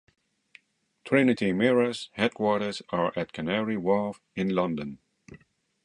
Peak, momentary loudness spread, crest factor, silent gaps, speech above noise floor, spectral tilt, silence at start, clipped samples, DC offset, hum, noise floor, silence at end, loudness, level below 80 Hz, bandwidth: -8 dBFS; 9 LU; 20 dB; none; 34 dB; -6.5 dB/octave; 1.05 s; under 0.1%; under 0.1%; none; -60 dBFS; 0.5 s; -27 LUFS; -64 dBFS; 11 kHz